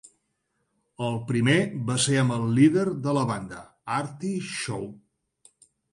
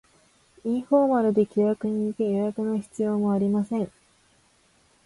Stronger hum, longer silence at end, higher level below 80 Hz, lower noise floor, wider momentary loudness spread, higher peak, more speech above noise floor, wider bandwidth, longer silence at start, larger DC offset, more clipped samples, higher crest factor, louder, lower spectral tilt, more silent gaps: neither; second, 0.95 s vs 1.15 s; about the same, -62 dBFS vs -66 dBFS; first, -76 dBFS vs -62 dBFS; first, 13 LU vs 8 LU; about the same, -8 dBFS vs -10 dBFS; first, 51 dB vs 39 dB; about the same, 11.5 kHz vs 11.5 kHz; first, 1 s vs 0.65 s; neither; neither; about the same, 18 dB vs 16 dB; about the same, -25 LUFS vs -25 LUFS; second, -5.5 dB/octave vs -8.5 dB/octave; neither